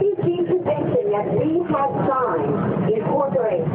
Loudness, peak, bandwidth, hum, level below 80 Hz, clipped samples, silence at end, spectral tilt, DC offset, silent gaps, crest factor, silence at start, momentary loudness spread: -21 LUFS; -10 dBFS; 3.9 kHz; none; -56 dBFS; under 0.1%; 0 s; -13 dB/octave; under 0.1%; none; 10 dB; 0 s; 1 LU